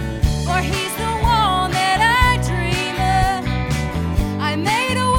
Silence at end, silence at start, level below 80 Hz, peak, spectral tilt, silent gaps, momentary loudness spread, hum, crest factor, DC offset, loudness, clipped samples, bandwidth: 0 s; 0 s; -26 dBFS; -2 dBFS; -4.5 dB/octave; none; 7 LU; none; 16 dB; under 0.1%; -18 LUFS; under 0.1%; 18.5 kHz